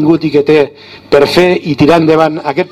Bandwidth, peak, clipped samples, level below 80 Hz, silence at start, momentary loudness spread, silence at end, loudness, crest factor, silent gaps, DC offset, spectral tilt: 14.5 kHz; 0 dBFS; 1%; -42 dBFS; 0 s; 5 LU; 0.05 s; -9 LUFS; 10 dB; none; under 0.1%; -6.5 dB/octave